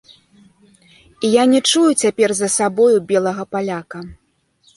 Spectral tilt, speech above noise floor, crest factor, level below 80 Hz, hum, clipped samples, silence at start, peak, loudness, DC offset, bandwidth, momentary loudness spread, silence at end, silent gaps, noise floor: -3.5 dB/octave; 42 dB; 16 dB; -56 dBFS; none; under 0.1%; 1.2 s; -2 dBFS; -16 LUFS; under 0.1%; 11.5 kHz; 14 LU; 0.65 s; none; -58 dBFS